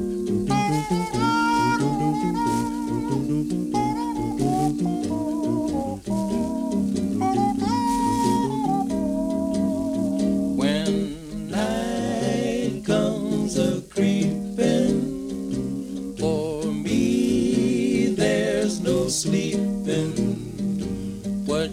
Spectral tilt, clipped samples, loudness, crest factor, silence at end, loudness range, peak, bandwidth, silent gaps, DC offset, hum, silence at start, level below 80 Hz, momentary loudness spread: -6 dB/octave; under 0.1%; -24 LUFS; 14 dB; 0 s; 2 LU; -8 dBFS; 16 kHz; none; under 0.1%; none; 0 s; -46 dBFS; 6 LU